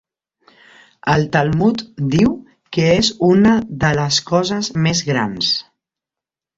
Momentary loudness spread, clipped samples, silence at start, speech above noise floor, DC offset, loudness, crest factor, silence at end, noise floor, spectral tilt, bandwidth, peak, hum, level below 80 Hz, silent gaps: 7 LU; under 0.1%; 1.05 s; 72 dB; under 0.1%; -16 LUFS; 16 dB; 0.95 s; -88 dBFS; -5 dB/octave; 8 kHz; -2 dBFS; none; -44 dBFS; none